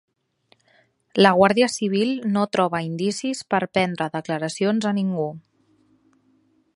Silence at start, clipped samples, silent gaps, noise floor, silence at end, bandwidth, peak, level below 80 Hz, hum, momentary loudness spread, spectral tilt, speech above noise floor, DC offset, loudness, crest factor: 1.15 s; under 0.1%; none; -63 dBFS; 1.35 s; 11.5 kHz; 0 dBFS; -64 dBFS; none; 10 LU; -5 dB/octave; 42 dB; under 0.1%; -21 LUFS; 22 dB